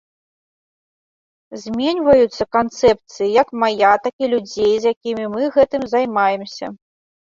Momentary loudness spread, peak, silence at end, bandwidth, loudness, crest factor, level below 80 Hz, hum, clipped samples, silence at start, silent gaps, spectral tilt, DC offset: 12 LU; -2 dBFS; 0.55 s; 7.6 kHz; -17 LUFS; 18 dB; -52 dBFS; none; under 0.1%; 1.5 s; 4.13-4.19 s, 4.96-5.01 s; -5 dB/octave; under 0.1%